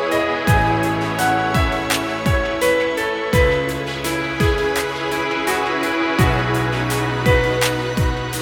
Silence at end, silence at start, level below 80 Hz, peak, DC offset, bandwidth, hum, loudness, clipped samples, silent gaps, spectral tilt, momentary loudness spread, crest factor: 0 s; 0 s; -30 dBFS; -2 dBFS; under 0.1%; 19 kHz; none; -19 LUFS; under 0.1%; none; -5 dB/octave; 5 LU; 16 dB